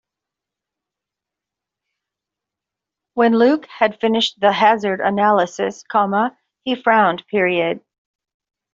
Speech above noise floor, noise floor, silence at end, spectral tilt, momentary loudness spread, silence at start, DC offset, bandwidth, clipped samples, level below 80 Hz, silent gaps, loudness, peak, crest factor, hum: 69 dB; -85 dBFS; 0.95 s; -5 dB/octave; 10 LU; 3.15 s; under 0.1%; 7.6 kHz; under 0.1%; -64 dBFS; none; -17 LUFS; -2 dBFS; 18 dB; none